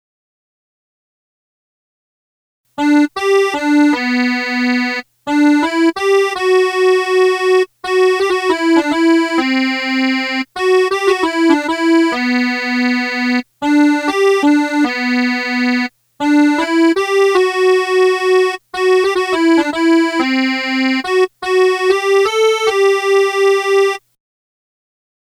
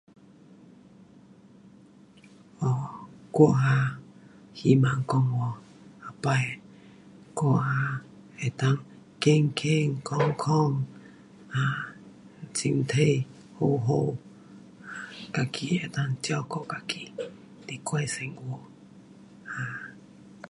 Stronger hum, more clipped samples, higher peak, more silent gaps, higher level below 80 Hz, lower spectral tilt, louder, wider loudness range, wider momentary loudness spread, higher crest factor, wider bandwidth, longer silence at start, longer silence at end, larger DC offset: neither; neither; first, 0 dBFS vs -6 dBFS; neither; first, -58 dBFS vs -64 dBFS; second, -2.5 dB/octave vs -6 dB/octave; first, -14 LUFS vs -27 LUFS; second, 2 LU vs 9 LU; second, 4 LU vs 19 LU; second, 14 dB vs 24 dB; first, 13 kHz vs 11 kHz; first, 2.8 s vs 1.65 s; first, 1.35 s vs 0.05 s; neither